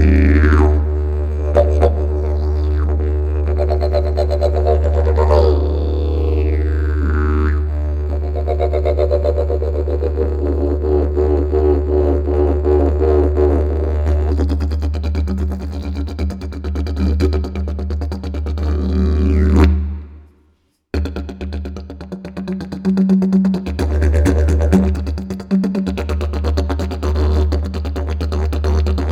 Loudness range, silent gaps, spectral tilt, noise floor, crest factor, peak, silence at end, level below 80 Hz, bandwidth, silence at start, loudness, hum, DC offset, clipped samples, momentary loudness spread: 5 LU; none; -8.5 dB/octave; -59 dBFS; 14 dB; -2 dBFS; 0 s; -18 dBFS; 7 kHz; 0 s; -17 LUFS; none; under 0.1%; under 0.1%; 10 LU